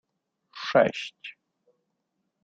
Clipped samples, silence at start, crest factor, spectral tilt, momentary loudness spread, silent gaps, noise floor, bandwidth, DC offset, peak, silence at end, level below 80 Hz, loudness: under 0.1%; 0.55 s; 24 dB; -5 dB/octave; 21 LU; none; -79 dBFS; 7.8 kHz; under 0.1%; -8 dBFS; 1.15 s; -72 dBFS; -25 LUFS